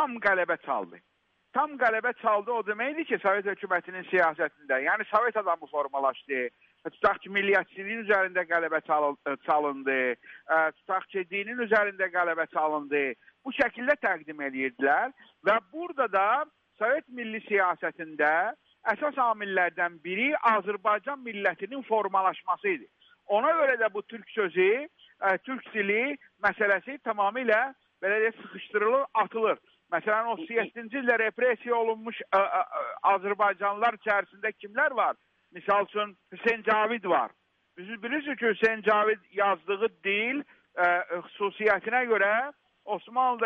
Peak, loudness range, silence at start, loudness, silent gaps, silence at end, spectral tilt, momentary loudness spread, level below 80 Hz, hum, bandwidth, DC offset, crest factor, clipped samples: -10 dBFS; 1 LU; 0 s; -28 LUFS; none; 0 s; -6 dB/octave; 9 LU; -72 dBFS; none; 6.6 kHz; under 0.1%; 18 dB; under 0.1%